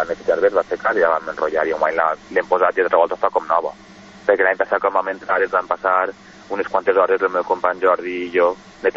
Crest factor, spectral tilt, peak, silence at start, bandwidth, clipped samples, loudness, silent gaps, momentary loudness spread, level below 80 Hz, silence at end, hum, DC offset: 16 dB; -5 dB/octave; -2 dBFS; 0 s; 7.4 kHz; under 0.1%; -19 LUFS; none; 5 LU; -56 dBFS; 0.05 s; none; under 0.1%